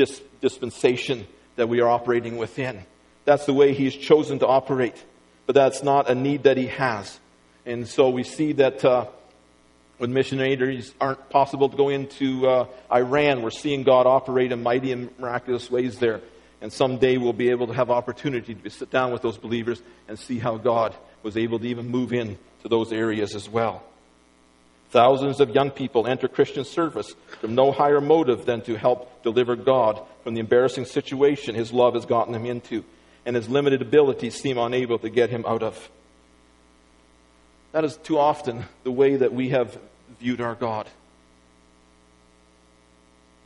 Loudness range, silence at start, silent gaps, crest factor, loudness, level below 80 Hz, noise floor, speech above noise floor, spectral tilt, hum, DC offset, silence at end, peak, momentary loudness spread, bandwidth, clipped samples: 6 LU; 0 s; none; 20 dB; -23 LUFS; -60 dBFS; -57 dBFS; 35 dB; -6 dB/octave; 60 Hz at -60 dBFS; under 0.1%; 2.55 s; -2 dBFS; 12 LU; 11.5 kHz; under 0.1%